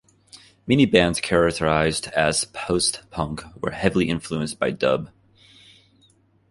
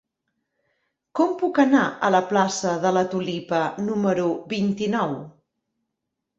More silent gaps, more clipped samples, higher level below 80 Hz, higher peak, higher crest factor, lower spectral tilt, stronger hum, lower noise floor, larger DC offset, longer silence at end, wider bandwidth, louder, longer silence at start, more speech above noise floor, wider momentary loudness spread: neither; neither; first, -46 dBFS vs -66 dBFS; first, -2 dBFS vs -6 dBFS; about the same, 20 dB vs 18 dB; about the same, -4.5 dB/octave vs -5.5 dB/octave; neither; second, -59 dBFS vs -81 dBFS; neither; first, 1.45 s vs 1.1 s; first, 11.5 kHz vs 8 kHz; about the same, -22 LUFS vs -22 LUFS; second, 0.35 s vs 1.15 s; second, 38 dB vs 60 dB; first, 12 LU vs 7 LU